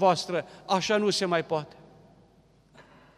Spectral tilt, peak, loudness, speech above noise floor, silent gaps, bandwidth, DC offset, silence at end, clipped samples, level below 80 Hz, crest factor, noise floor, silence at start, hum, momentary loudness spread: -4 dB/octave; -10 dBFS; -27 LUFS; 34 dB; none; 14.5 kHz; under 0.1%; 0.35 s; under 0.1%; -68 dBFS; 20 dB; -60 dBFS; 0 s; none; 9 LU